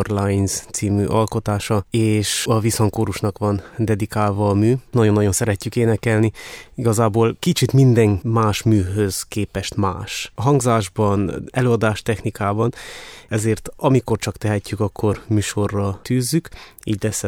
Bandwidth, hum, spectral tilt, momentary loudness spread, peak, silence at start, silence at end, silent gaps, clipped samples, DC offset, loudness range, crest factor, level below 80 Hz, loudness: 17 kHz; none; -6 dB/octave; 7 LU; -2 dBFS; 0 s; 0 s; none; under 0.1%; under 0.1%; 4 LU; 16 dB; -44 dBFS; -19 LUFS